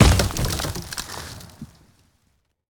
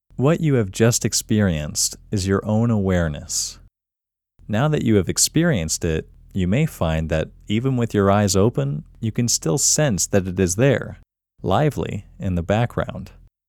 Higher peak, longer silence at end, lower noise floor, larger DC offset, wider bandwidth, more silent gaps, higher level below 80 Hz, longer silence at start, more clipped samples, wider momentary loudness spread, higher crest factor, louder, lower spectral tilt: first, 0 dBFS vs -4 dBFS; first, 1.05 s vs 0.4 s; second, -68 dBFS vs -87 dBFS; neither; about the same, over 20 kHz vs 19 kHz; neither; first, -30 dBFS vs -40 dBFS; second, 0 s vs 0.2 s; neither; first, 22 LU vs 10 LU; first, 24 dB vs 18 dB; second, -24 LUFS vs -20 LUFS; about the same, -4.5 dB/octave vs -4.5 dB/octave